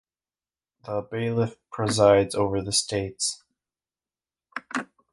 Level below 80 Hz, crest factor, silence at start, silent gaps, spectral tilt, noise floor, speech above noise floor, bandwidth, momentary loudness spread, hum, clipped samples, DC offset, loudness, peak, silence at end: -54 dBFS; 22 dB; 0.85 s; none; -4 dB/octave; under -90 dBFS; over 66 dB; 11.5 kHz; 18 LU; none; under 0.1%; under 0.1%; -25 LUFS; -6 dBFS; 0.3 s